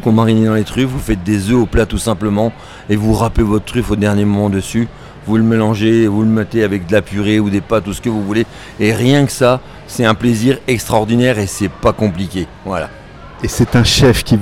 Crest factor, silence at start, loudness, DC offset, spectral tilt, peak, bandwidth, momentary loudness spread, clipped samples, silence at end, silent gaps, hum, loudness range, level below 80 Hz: 14 dB; 0 s; -14 LUFS; under 0.1%; -6 dB/octave; 0 dBFS; 16 kHz; 10 LU; under 0.1%; 0 s; none; none; 2 LU; -30 dBFS